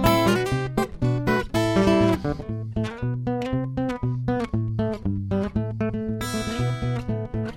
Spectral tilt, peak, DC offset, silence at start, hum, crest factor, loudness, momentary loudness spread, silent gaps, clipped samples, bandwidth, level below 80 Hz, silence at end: -6.5 dB/octave; -6 dBFS; under 0.1%; 0 s; none; 18 dB; -25 LUFS; 8 LU; none; under 0.1%; 17 kHz; -40 dBFS; 0 s